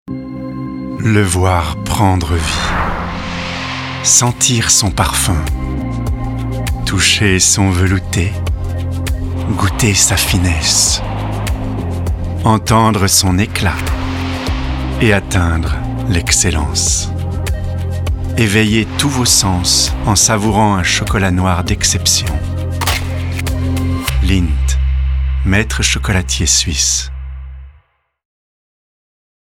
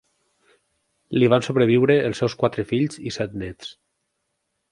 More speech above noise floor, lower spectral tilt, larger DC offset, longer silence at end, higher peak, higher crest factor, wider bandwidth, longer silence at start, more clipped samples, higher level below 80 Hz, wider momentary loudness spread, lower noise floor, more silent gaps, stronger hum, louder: second, 39 dB vs 55 dB; second, -3.5 dB/octave vs -6.5 dB/octave; neither; first, 1.8 s vs 1 s; about the same, 0 dBFS vs -2 dBFS; second, 14 dB vs 20 dB; first, 19 kHz vs 11 kHz; second, 0.05 s vs 1.1 s; neither; first, -22 dBFS vs -54 dBFS; second, 10 LU vs 15 LU; second, -52 dBFS vs -76 dBFS; neither; neither; first, -14 LUFS vs -21 LUFS